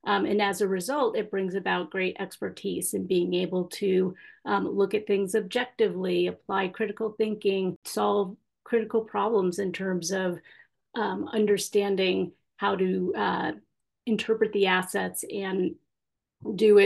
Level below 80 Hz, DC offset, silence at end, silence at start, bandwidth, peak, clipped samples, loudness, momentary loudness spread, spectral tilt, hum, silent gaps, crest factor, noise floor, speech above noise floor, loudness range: -74 dBFS; under 0.1%; 0 s; 0.05 s; 12.5 kHz; -8 dBFS; under 0.1%; -27 LUFS; 7 LU; -4.5 dB/octave; none; 7.76-7.82 s; 18 dB; -86 dBFS; 60 dB; 1 LU